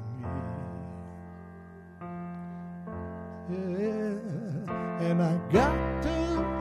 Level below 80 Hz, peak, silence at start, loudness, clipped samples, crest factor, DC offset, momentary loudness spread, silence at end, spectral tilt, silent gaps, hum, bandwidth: -44 dBFS; -10 dBFS; 0 s; -31 LUFS; under 0.1%; 22 dB; under 0.1%; 19 LU; 0 s; -7.5 dB/octave; none; none; 11 kHz